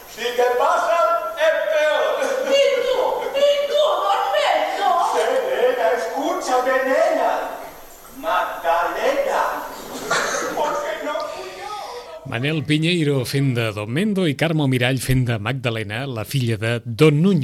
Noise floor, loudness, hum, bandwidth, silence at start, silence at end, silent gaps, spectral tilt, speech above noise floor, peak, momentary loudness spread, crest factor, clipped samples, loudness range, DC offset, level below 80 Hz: -40 dBFS; -20 LUFS; none; 16.5 kHz; 0 s; 0 s; none; -5 dB/octave; 20 dB; -4 dBFS; 10 LU; 16 dB; under 0.1%; 4 LU; under 0.1%; -48 dBFS